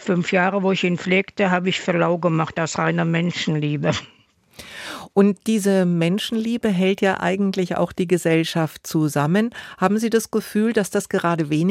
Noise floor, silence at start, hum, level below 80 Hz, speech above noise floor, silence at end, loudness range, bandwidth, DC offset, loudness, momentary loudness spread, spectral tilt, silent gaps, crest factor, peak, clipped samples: -45 dBFS; 0 s; none; -60 dBFS; 26 dB; 0 s; 2 LU; 16 kHz; under 0.1%; -20 LUFS; 5 LU; -5.5 dB/octave; none; 16 dB; -4 dBFS; under 0.1%